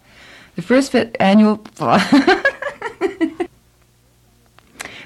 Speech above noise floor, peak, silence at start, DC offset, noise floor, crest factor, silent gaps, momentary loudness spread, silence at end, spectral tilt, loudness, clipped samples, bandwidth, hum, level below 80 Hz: 40 dB; -2 dBFS; 0.55 s; under 0.1%; -54 dBFS; 16 dB; none; 18 LU; 0 s; -5.5 dB/octave; -16 LUFS; under 0.1%; 12.5 kHz; none; -54 dBFS